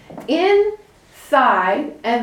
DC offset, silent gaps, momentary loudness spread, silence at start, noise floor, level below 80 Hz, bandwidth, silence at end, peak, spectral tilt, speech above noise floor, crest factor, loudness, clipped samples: under 0.1%; none; 8 LU; 0.1 s; -45 dBFS; -58 dBFS; 14.5 kHz; 0 s; -2 dBFS; -4.5 dB/octave; 29 dB; 16 dB; -17 LUFS; under 0.1%